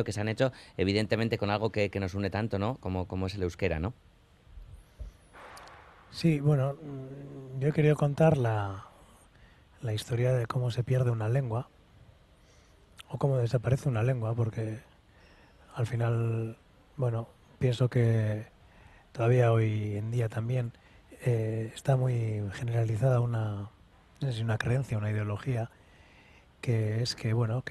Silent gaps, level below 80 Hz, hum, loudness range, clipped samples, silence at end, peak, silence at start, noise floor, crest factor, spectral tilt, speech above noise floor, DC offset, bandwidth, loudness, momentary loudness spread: none; -56 dBFS; none; 5 LU; under 0.1%; 0 s; -12 dBFS; 0 s; -59 dBFS; 20 dB; -7.5 dB/octave; 30 dB; under 0.1%; 12 kHz; -30 LUFS; 16 LU